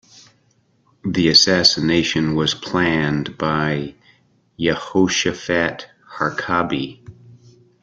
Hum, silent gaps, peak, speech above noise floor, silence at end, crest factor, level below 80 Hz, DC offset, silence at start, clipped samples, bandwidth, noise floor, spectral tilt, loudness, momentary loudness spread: none; none; 0 dBFS; 42 dB; 0.5 s; 20 dB; -50 dBFS; under 0.1%; 1.05 s; under 0.1%; 12 kHz; -61 dBFS; -4 dB/octave; -18 LUFS; 13 LU